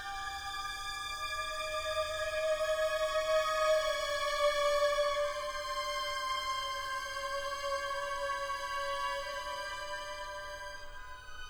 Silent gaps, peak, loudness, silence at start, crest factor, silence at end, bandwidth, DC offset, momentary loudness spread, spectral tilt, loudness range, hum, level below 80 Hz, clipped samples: none; -20 dBFS; -34 LUFS; 0 s; 16 dB; 0 s; over 20 kHz; under 0.1%; 10 LU; -0.5 dB/octave; 6 LU; none; -54 dBFS; under 0.1%